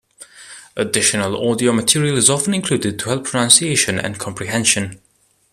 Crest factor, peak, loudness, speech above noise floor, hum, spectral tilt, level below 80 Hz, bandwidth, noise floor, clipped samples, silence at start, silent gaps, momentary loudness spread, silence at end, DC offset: 18 dB; 0 dBFS; -16 LUFS; 24 dB; none; -3 dB/octave; -54 dBFS; 14.5 kHz; -41 dBFS; under 0.1%; 0.2 s; none; 13 LU; 0.55 s; under 0.1%